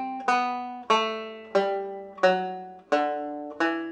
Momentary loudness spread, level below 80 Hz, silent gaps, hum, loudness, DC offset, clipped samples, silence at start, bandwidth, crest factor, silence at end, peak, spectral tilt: 11 LU; -78 dBFS; none; none; -27 LUFS; under 0.1%; under 0.1%; 0 s; 9.4 kHz; 18 dB; 0 s; -8 dBFS; -4 dB/octave